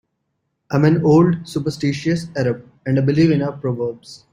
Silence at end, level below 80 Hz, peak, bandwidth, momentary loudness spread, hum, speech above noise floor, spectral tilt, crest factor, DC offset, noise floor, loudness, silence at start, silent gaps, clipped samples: 0.15 s; -52 dBFS; -2 dBFS; 11.5 kHz; 11 LU; none; 55 dB; -7.5 dB/octave; 16 dB; under 0.1%; -73 dBFS; -18 LUFS; 0.7 s; none; under 0.1%